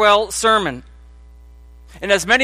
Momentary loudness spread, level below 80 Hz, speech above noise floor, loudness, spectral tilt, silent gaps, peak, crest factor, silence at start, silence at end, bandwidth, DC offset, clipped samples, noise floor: 15 LU; -42 dBFS; 26 dB; -16 LUFS; -2 dB/octave; none; 0 dBFS; 18 dB; 0 s; 0 s; 15.5 kHz; under 0.1%; under 0.1%; -42 dBFS